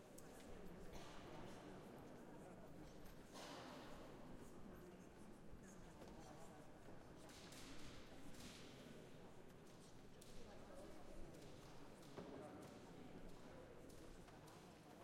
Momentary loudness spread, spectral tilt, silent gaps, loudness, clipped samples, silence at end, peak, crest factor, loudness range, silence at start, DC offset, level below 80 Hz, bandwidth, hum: 5 LU; -5 dB/octave; none; -60 LUFS; under 0.1%; 0 s; -42 dBFS; 16 dB; 2 LU; 0 s; under 0.1%; -68 dBFS; 16 kHz; none